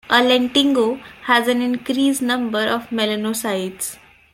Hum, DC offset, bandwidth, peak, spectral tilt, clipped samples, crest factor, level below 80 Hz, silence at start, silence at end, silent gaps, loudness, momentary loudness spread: none; under 0.1%; 16.5 kHz; -2 dBFS; -3 dB/octave; under 0.1%; 18 dB; -58 dBFS; 0.1 s; 0.4 s; none; -19 LUFS; 9 LU